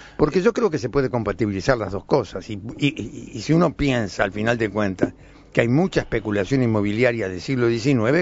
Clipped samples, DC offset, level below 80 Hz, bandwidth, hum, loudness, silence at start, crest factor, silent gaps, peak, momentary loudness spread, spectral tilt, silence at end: under 0.1%; under 0.1%; -42 dBFS; 8 kHz; none; -22 LUFS; 0 s; 20 dB; none; 0 dBFS; 7 LU; -6.5 dB/octave; 0 s